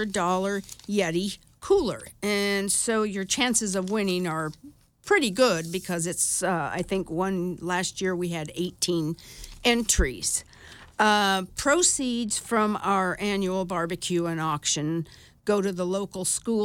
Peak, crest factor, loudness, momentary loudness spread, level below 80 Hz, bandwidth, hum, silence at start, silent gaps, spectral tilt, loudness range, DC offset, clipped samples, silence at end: -8 dBFS; 18 dB; -26 LUFS; 9 LU; -44 dBFS; 17.5 kHz; none; 0 s; none; -3.5 dB/octave; 3 LU; under 0.1%; under 0.1%; 0 s